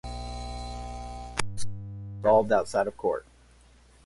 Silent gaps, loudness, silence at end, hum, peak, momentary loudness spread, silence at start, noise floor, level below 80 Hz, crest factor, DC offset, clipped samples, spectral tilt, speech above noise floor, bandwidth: none; -29 LUFS; 0.85 s; none; -10 dBFS; 16 LU; 0.05 s; -56 dBFS; -44 dBFS; 20 dB; under 0.1%; under 0.1%; -5 dB/octave; 32 dB; 11.5 kHz